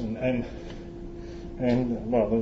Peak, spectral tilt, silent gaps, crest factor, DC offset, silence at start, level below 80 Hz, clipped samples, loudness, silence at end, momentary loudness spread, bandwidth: -10 dBFS; -8.5 dB/octave; none; 18 dB; under 0.1%; 0 s; -42 dBFS; under 0.1%; -28 LUFS; 0 s; 15 LU; 7.4 kHz